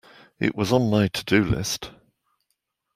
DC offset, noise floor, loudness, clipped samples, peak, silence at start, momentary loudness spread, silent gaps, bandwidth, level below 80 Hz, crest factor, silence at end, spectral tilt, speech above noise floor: under 0.1%; -77 dBFS; -23 LUFS; under 0.1%; -6 dBFS; 0.4 s; 9 LU; none; 16 kHz; -48 dBFS; 20 dB; 1.05 s; -5 dB/octave; 54 dB